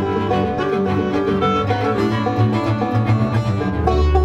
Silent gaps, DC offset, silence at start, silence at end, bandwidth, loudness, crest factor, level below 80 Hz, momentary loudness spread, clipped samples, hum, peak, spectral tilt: none; under 0.1%; 0 s; 0 s; 8.2 kHz; -18 LUFS; 14 dB; -28 dBFS; 2 LU; under 0.1%; none; -2 dBFS; -8 dB/octave